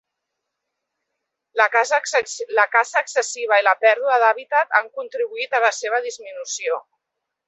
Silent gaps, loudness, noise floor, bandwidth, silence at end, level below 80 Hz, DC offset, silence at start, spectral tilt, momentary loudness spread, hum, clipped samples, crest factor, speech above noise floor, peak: none; -19 LUFS; -81 dBFS; 8.4 kHz; 0.65 s; -78 dBFS; under 0.1%; 1.55 s; 2 dB/octave; 11 LU; none; under 0.1%; 20 dB; 61 dB; -2 dBFS